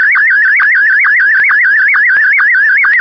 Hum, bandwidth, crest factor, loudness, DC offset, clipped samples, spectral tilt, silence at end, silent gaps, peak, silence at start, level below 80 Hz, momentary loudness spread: none; 6 kHz; 6 dB; -6 LUFS; under 0.1%; under 0.1%; 4 dB/octave; 0 s; none; -2 dBFS; 0 s; -60 dBFS; 0 LU